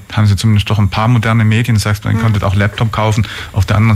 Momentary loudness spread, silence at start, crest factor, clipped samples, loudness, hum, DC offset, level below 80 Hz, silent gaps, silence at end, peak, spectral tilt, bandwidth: 3 LU; 0 s; 10 dB; under 0.1%; -13 LUFS; none; under 0.1%; -34 dBFS; none; 0 s; -2 dBFS; -6.5 dB/octave; 14 kHz